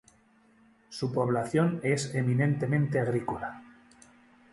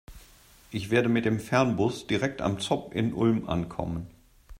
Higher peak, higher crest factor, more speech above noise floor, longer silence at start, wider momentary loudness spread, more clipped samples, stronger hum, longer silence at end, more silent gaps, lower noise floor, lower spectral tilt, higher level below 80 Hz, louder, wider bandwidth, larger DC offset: second, -14 dBFS vs -8 dBFS; about the same, 16 dB vs 20 dB; first, 35 dB vs 28 dB; first, 0.9 s vs 0.1 s; about the same, 11 LU vs 11 LU; neither; neither; first, 0.85 s vs 0 s; neither; first, -63 dBFS vs -55 dBFS; about the same, -6.5 dB/octave vs -6 dB/octave; second, -62 dBFS vs -52 dBFS; about the same, -29 LUFS vs -28 LUFS; second, 11.5 kHz vs 16 kHz; neither